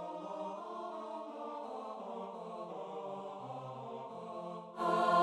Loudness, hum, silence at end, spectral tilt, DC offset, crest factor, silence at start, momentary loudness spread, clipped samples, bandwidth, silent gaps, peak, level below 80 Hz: -42 LUFS; none; 0 s; -6 dB/octave; under 0.1%; 22 dB; 0 s; 9 LU; under 0.1%; 12.5 kHz; none; -18 dBFS; -84 dBFS